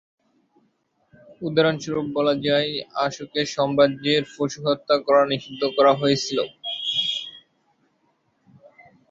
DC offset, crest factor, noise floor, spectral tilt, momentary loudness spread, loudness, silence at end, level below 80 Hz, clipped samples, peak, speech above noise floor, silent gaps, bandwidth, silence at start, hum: under 0.1%; 20 dB; -67 dBFS; -4.5 dB/octave; 9 LU; -22 LUFS; 1.7 s; -64 dBFS; under 0.1%; -4 dBFS; 46 dB; none; 7.8 kHz; 1.3 s; none